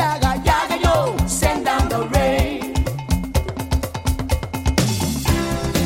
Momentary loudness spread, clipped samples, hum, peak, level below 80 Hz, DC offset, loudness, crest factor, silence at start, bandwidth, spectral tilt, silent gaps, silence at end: 6 LU; under 0.1%; none; 0 dBFS; -26 dBFS; under 0.1%; -20 LUFS; 18 dB; 0 s; 16.5 kHz; -5 dB/octave; none; 0 s